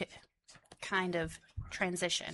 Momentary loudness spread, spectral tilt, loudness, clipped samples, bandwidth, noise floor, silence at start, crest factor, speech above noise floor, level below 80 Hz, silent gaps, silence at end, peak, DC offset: 14 LU; -3 dB/octave; -36 LUFS; under 0.1%; 11.5 kHz; -63 dBFS; 0 s; 20 dB; 27 dB; -58 dBFS; none; 0 s; -20 dBFS; under 0.1%